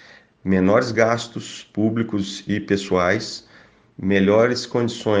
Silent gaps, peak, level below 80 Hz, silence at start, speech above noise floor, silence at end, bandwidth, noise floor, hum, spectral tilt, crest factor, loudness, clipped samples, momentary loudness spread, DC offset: none; -2 dBFS; -58 dBFS; 0.45 s; 30 dB; 0 s; 9.6 kHz; -50 dBFS; none; -6 dB/octave; 20 dB; -20 LUFS; under 0.1%; 14 LU; under 0.1%